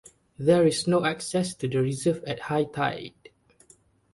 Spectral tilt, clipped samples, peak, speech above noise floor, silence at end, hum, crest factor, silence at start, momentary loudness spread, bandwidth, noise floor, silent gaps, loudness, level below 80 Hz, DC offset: -5.5 dB/octave; under 0.1%; -8 dBFS; 35 dB; 1.05 s; none; 18 dB; 0.4 s; 9 LU; 11.5 kHz; -60 dBFS; none; -25 LUFS; -60 dBFS; under 0.1%